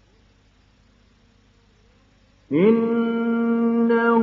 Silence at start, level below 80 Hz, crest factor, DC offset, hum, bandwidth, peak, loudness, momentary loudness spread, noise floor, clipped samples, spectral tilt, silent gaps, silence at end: 2.5 s; -62 dBFS; 16 dB; under 0.1%; none; 4.7 kHz; -6 dBFS; -20 LUFS; 4 LU; -57 dBFS; under 0.1%; -9.5 dB/octave; none; 0 s